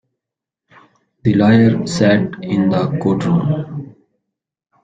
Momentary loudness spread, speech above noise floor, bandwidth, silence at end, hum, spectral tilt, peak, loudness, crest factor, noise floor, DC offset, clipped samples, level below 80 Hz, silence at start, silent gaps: 10 LU; 70 dB; 9.2 kHz; 1 s; none; -7 dB/octave; -2 dBFS; -15 LUFS; 16 dB; -84 dBFS; under 0.1%; under 0.1%; -50 dBFS; 1.25 s; none